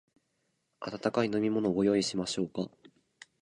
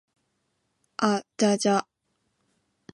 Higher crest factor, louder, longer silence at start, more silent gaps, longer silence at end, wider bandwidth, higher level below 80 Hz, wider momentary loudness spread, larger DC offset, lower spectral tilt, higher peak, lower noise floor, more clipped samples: about the same, 20 dB vs 20 dB; second, -31 LUFS vs -25 LUFS; second, 0.8 s vs 1 s; neither; second, 0.75 s vs 1.1 s; about the same, 11.5 kHz vs 11.5 kHz; first, -66 dBFS vs -76 dBFS; first, 14 LU vs 5 LU; neither; about the same, -5 dB/octave vs -4.5 dB/octave; second, -12 dBFS vs -8 dBFS; about the same, -78 dBFS vs -76 dBFS; neither